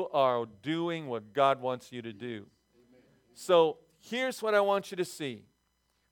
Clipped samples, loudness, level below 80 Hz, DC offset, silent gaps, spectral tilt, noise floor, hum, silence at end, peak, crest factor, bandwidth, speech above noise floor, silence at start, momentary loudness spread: under 0.1%; -30 LUFS; -80 dBFS; under 0.1%; none; -5 dB/octave; -75 dBFS; none; 0.7 s; -12 dBFS; 20 dB; 18.5 kHz; 45 dB; 0 s; 16 LU